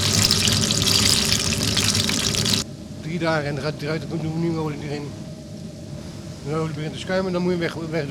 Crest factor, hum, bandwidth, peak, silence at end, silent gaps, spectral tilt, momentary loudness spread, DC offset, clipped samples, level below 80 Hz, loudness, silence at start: 18 dB; none; over 20 kHz; -4 dBFS; 0 s; none; -3 dB/octave; 19 LU; under 0.1%; under 0.1%; -44 dBFS; -21 LUFS; 0 s